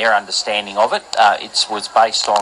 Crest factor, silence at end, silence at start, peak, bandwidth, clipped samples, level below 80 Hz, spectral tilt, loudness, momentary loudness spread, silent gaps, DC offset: 16 dB; 0 s; 0 s; 0 dBFS; 11.5 kHz; under 0.1%; -62 dBFS; 0 dB/octave; -16 LUFS; 4 LU; none; under 0.1%